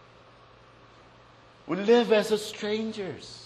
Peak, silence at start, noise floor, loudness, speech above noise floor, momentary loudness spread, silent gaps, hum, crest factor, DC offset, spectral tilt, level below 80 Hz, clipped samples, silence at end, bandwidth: -10 dBFS; 1.65 s; -54 dBFS; -26 LUFS; 28 dB; 14 LU; none; none; 20 dB; under 0.1%; -4.5 dB/octave; -66 dBFS; under 0.1%; 0 s; 13 kHz